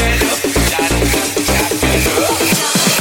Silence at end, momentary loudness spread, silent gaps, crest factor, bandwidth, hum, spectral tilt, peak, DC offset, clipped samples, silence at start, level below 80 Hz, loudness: 0 s; 2 LU; none; 14 dB; 17 kHz; none; -3 dB/octave; 0 dBFS; under 0.1%; under 0.1%; 0 s; -24 dBFS; -13 LUFS